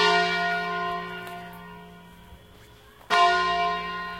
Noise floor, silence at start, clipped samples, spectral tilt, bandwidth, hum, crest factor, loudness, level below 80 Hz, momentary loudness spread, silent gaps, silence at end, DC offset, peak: -51 dBFS; 0 s; under 0.1%; -3 dB/octave; 16.5 kHz; none; 20 dB; -24 LUFS; -56 dBFS; 22 LU; none; 0 s; under 0.1%; -6 dBFS